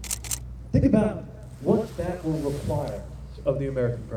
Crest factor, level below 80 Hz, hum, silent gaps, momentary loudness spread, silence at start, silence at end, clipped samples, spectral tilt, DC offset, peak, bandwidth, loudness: 18 dB; -40 dBFS; none; none; 13 LU; 0 s; 0 s; under 0.1%; -6.5 dB/octave; under 0.1%; -8 dBFS; over 20 kHz; -26 LUFS